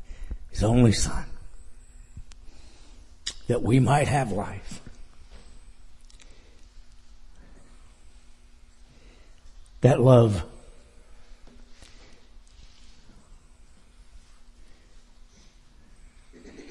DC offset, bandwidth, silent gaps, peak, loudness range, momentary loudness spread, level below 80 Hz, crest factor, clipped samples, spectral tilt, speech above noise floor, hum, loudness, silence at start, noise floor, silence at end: under 0.1%; 11.5 kHz; none; -4 dBFS; 7 LU; 27 LU; -42 dBFS; 24 dB; under 0.1%; -6.5 dB/octave; 32 dB; none; -23 LUFS; 0 s; -52 dBFS; 0 s